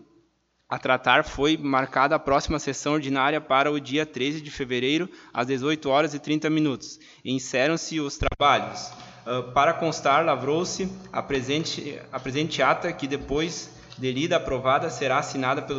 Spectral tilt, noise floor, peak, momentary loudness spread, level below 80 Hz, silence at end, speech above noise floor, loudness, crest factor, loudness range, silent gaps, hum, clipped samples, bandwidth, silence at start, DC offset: -4.5 dB/octave; -68 dBFS; -4 dBFS; 11 LU; -46 dBFS; 0 s; 43 dB; -25 LUFS; 22 dB; 3 LU; none; none; under 0.1%; 8 kHz; 0.7 s; under 0.1%